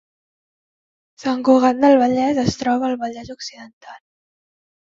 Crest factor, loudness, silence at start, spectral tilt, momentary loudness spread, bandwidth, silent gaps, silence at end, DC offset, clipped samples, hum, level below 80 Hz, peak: 18 dB; -17 LUFS; 1.2 s; -6 dB/octave; 18 LU; 7.6 kHz; 3.73-3.81 s; 0.9 s; under 0.1%; under 0.1%; none; -54 dBFS; -2 dBFS